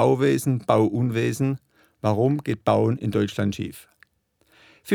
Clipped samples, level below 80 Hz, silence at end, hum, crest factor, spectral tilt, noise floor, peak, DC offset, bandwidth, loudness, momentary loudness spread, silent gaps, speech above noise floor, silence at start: under 0.1%; -60 dBFS; 0 s; none; 20 dB; -7 dB/octave; -66 dBFS; -4 dBFS; under 0.1%; 19 kHz; -23 LUFS; 10 LU; none; 44 dB; 0 s